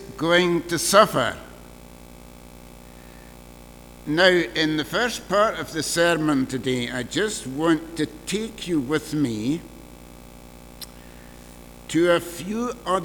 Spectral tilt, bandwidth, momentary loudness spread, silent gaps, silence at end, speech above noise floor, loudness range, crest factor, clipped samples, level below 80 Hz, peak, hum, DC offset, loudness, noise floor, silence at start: -4 dB/octave; over 20 kHz; 24 LU; none; 0 s; 22 dB; 7 LU; 22 dB; under 0.1%; -48 dBFS; -2 dBFS; 60 Hz at -50 dBFS; under 0.1%; -22 LUFS; -44 dBFS; 0 s